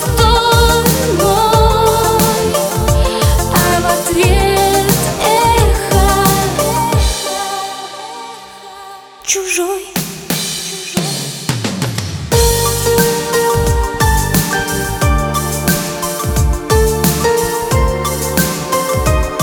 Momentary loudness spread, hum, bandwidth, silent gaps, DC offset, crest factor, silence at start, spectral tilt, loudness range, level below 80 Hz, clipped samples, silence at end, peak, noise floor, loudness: 9 LU; none; over 20 kHz; none; under 0.1%; 14 dB; 0 s; -4 dB/octave; 7 LU; -20 dBFS; under 0.1%; 0 s; 0 dBFS; -33 dBFS; -13 LUFS